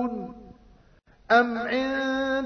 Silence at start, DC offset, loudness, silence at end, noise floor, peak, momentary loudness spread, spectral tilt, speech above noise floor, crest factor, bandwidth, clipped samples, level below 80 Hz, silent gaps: 0 s; under 0.1%; -24 LUFS; 0 s; -57 dBFS; -6 dBFS; 14 LU; -5 dB/octave; 32 dB; 20 dB; 6.6 kHz; under 0.1%; -56 dBFS; none